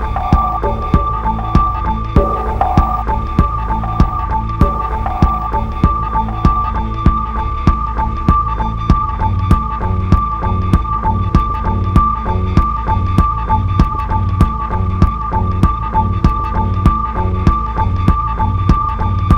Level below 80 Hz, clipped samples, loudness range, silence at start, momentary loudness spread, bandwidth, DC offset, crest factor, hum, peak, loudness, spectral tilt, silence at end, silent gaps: -18 dBFS; 0.3%; 1 LU; 0 s; 4 LU; 6.6 kHz; under 0.1%; 14 dB; none; 0 dBFS; -15 LUFS; -9 dB/octave; 0 s; none